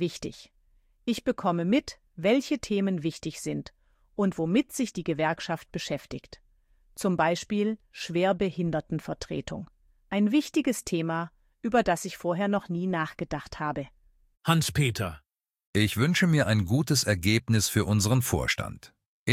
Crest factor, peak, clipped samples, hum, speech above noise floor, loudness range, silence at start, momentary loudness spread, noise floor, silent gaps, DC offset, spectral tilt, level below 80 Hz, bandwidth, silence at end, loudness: 20 dB; -8 dBFS; under 0.1%; none; 37 dB; 5 LU; 0 s; 13 LU; -64 dBFS; 15.66-15.73 s, 19.06-19.26 s; under 0.1%; -5 dB/octave; -52 dBFS; 16 kHz; 0 s; -28 LUFS